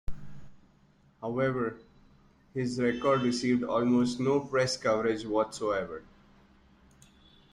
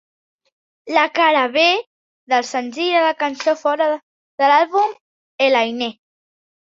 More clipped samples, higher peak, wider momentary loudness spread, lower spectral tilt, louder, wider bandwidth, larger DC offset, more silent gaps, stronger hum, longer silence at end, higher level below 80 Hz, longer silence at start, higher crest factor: neither; second, -14 dBFS vs -2 dBFS; first, 14 LU vs 8 LU; first, -5.5 dB/octave vs -2 dB/octave; second, -29 LUFS vs -17 LUFS; first, 11.5 kHz vs 7.8 kHz; neither; second, none vs 1.87-2.27 s, 4.03-4.38 s, 5.01-5.39 s; neither; first, 1.5 s vs 0.75 s; first, -54 dBFS vs -72 dBFS; second, 0.1 s vs 0.85 s; about the same, 18 dB vs 18 dB